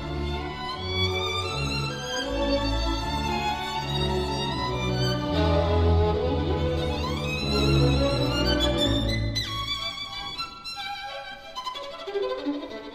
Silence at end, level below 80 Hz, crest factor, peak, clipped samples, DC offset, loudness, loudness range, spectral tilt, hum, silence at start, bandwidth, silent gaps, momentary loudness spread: 0 s; -36 dBFS; 16 dB; -10 dBFS; under 0.1%; under 0.1%; -26 LUFS; 6 LU; -5.5 dB/octave; none; 0 s; 15.5 kHz; none; 10 LU